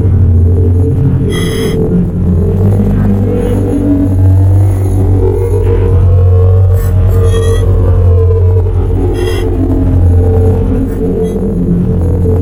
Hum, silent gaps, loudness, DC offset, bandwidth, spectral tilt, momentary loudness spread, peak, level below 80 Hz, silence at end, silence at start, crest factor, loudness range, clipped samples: none; none; -10 LUFS; under 0.1%; 13.5 kHz; -8.5 dB/octave; 5 LU; 0 dBFS; -16 dBFS; 0 s; 0 s; 8 dB; 2 LU; under 0.1%